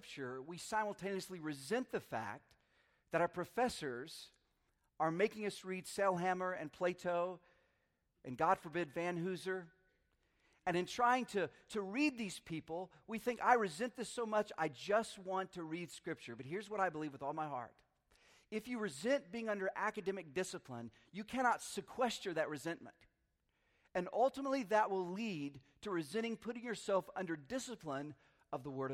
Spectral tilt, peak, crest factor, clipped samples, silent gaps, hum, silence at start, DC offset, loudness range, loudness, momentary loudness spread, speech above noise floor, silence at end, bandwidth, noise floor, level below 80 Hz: -4.5 dB/octave; -16 dBFS; 24 dB; under 0.1%; none; none; 0.05 s; under 0.1%; 4 LU; -40 LUFS; 12 LU; 42 dB; 0 s; 16 kHz; -82 dBFS; -76 dBFS